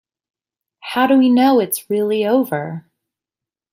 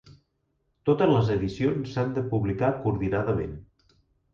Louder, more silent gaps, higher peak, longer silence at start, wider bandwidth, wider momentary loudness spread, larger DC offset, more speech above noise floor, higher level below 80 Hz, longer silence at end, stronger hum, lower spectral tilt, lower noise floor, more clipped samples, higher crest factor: first, -16 LUFS vs -26 LUFS; neither; first, -2 dBFS vs -10 dBFS; first, 0.85 s vs 0.1 s; first, 16 kHz vs 7.2 kHz; first, 16 LU vs 9 LU; neither; first, 73 dB vs 49 dB; second, -68 dBFS vs -48 dBFS; first, 0.95 s vs 0.7 s; neither; second, -5 dB/octave vs -8.5 dB/octave; first, -88 dBFS vs -74 dBFS; neither; about the same, 16 dB vs 18 dB